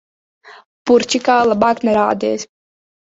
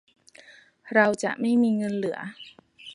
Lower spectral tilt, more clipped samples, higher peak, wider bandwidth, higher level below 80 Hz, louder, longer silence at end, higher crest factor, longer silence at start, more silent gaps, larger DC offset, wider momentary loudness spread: second, -4 dB/octave vs -5.5 dB/octave; neither; first, -2 dBFS vs -6 dBFS; second, 8 kHz vs 11 kHz; first, -56 dBFS vs -74 dBFS; first, -15 LUFS vs -24 LUFS; first, 0.65 s vs 0 s; second, 16 dB vs 22 dB; second, 0.45 s vs 0.85 s; first, 0.66-0.85 s vs none; neither; second, 12 LU vs 24 LU